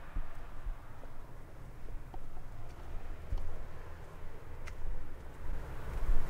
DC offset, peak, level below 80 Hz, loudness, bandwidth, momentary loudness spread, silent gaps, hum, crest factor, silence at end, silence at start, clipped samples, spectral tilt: under 0.1%; -14 dBFS; -38 dBFS; -48 LUFS; 3.7 kHz; 8 LU; none; none; 20 dB; 0 s; 0 s; under 0.1%; -6.5 dB/octave